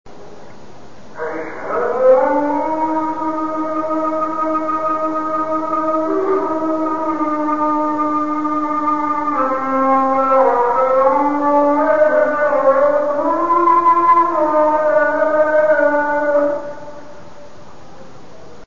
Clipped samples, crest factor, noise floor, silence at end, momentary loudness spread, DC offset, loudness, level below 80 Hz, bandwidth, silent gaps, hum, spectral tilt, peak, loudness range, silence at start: under 0.1%; 16 dB; -40 dBFS; 0 s; 8 LU; 3%; -16 LUFS; -56 dBFS; 7.2 kHz; none; none; -6.5 dB/octave; 0 dBFS; 5 LU; 0.05 s